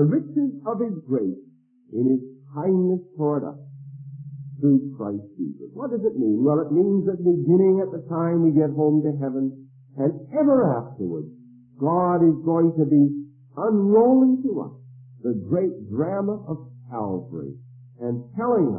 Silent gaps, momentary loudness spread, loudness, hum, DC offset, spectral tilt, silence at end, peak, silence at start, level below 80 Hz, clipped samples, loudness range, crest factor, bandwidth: none; 17 LU; -22 LUFS; none; under 0.1%; -16 dB/octave; 0 s; -8 dBFS; 0 s; -68 dBFS; under 0.1%; 7 LU; 16 dB; 2.3 kHz